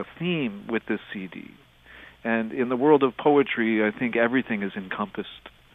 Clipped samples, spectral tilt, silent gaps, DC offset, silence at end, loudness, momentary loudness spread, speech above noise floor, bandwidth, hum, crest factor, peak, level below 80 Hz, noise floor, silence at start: under 0.1%; -8.5 dB/octave; none; under 0.1%; 0.25 s; -24 LUFS; 16 LU; 24 dB; 3.9 kHz; none; 20 dB; -6 dBFS; -62 dBFS; -49 dBFS; 0 s